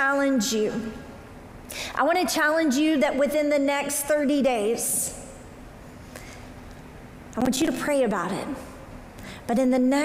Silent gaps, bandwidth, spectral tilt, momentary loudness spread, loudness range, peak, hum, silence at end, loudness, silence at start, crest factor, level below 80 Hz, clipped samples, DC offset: none; 16 kHz; -3.5 dB/octave; 22 LU; 7 LU; -10 dBFS; none; 0 s; -24 LUFS; 0 s; 14 dB; -50 dBFS; under 0.1%; under 0.1%